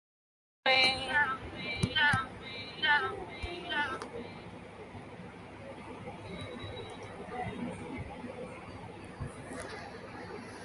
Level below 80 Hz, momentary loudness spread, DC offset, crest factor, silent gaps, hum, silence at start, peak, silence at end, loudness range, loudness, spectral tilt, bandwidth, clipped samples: -56 dBFS; 20 LU; under 0.1%; 24 dB; none; none; 0.65 s; -12 dBFS; 0 s; 14 LU; -33 LUFS; -4 dB/octave; 11.5 kHz; under 0.1%